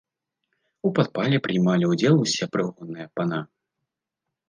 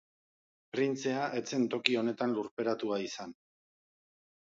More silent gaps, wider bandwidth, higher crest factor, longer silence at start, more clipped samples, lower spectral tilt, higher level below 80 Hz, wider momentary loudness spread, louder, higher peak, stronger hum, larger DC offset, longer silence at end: second, none vs 2.51-2.57 s; first, 9.8 kHz vs 7.8 kHz; second, 20 dB vs 30 dB; about the same, 0.85 s vs 0.75 s; neither; first, -6 dB/octave vs -4.5 dB/octave; first, -68 dBFS vs -82 dBFS; about the same, 13 LU vs 11 LU; first, -23 LUFS vs -33 LUFS; about the same, -6 dBFS vs -6 dBFS; neither; neither; second, 1.05 s vs 1.2 s